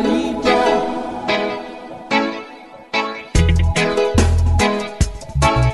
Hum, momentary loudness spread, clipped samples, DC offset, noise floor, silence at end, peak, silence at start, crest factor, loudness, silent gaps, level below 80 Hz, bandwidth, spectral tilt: none; 12 LU; under 0.1%; under 0.1%; -38 dBFS; 0 s; 0 dBFS; 0 s; 16 dB; -18 LUFS; none; -24 dBFS; 12 kHz; -5.5 dB/octave